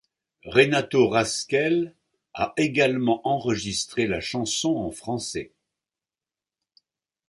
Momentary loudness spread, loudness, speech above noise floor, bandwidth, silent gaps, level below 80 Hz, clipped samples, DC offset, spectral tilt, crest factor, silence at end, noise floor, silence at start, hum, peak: 10 LU; -24 LUFS; over 67 dB; 11.5 kHz; none; -56 dBFS; under 0.1%; under 0.1%; -4 dB/octave; 22 dB; 1.85 s; under -90 dBFS; 0.45 s; none; -4 dBFS